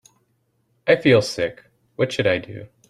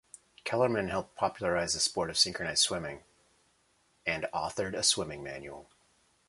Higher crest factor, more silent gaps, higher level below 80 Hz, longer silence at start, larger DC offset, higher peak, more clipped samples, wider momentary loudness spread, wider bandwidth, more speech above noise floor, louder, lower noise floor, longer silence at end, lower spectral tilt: about the same, 20 dB vs 22 dB; neither; about the same, -58 dBFS vs -60 dBFS; first, 0.85 s vs 0.45 s; neither; first, -2 dBFS vs -10 dBFS; neither; about the same, 14 LU vs 15 LU; about the same, 13 kHz vs 12 kHz; first, 48 dB vs 39 dB; first, -20 LUFS vs -30 LUFS; about the same, -67 dBFS vs -70 dBFS; second, 0.25 s vs 0.65 s; first, -5.5 dB/octave vs -2 dB/octave